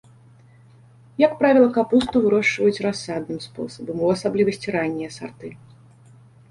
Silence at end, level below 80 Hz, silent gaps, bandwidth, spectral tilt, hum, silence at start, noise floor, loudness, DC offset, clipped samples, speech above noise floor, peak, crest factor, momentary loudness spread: 0.95 s; -56 dBFS; none; 11.5 kHz; -5.5 dB/octave; none; 1.2 s; -50 dBFS; -20 LUFS; under 0.1%; under 0.1%; 30 dB; -4 dBFS; 18 dB; 18 LU